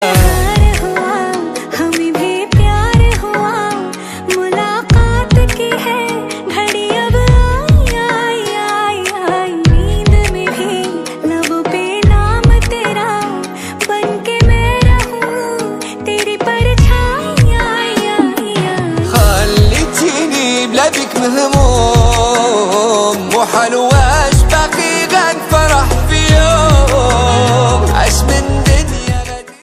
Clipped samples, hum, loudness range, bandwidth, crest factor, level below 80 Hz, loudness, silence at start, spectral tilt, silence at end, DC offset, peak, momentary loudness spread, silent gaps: under 0.1%; none; 4 LU; 15.5 kHz; 10 dB; -16 dBFS; -12 LUFS; 0 s; -5 dB/octave; 0.1 s; under 0.1%; 0 dBFS; 7 LU; none